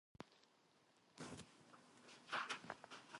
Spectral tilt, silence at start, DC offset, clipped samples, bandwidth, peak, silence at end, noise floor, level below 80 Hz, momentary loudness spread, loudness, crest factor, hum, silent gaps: -2.5 dB/octave; 0.2 s; under 0.1%; under 0.1%; 11.5 kHz; -30 dBFS; 0 s; -76 dBFS; -84 dBFS; 20 LU; -51 LUFS; 24 dB; none; none